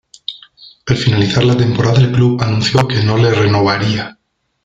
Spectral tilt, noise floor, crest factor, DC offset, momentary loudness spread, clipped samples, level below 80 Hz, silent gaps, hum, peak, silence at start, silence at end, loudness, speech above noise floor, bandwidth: -6.5 dB/octave; -42 dBFS; 12 dB; under 0.1%; 15 LU; under 0.1%; -42 dBFS; none; none; 0 dBFS; 0.3 s; 0.55 s; -13 LUFS; 30 dB; 7.8 kHz